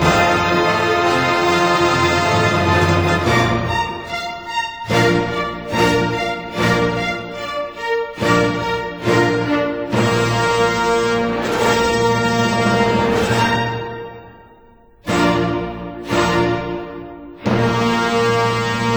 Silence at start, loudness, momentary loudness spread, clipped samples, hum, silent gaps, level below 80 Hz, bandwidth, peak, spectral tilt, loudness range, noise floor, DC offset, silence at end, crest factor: 0 s; -17 LUFS; 10 LU; under 0.1%; none; none; -40 dBFS; over 20 kHz; -2 dBFS; -5 dB/octave; 5 LU; -47 dBFS; under 0.1%; 0 s; 16 dB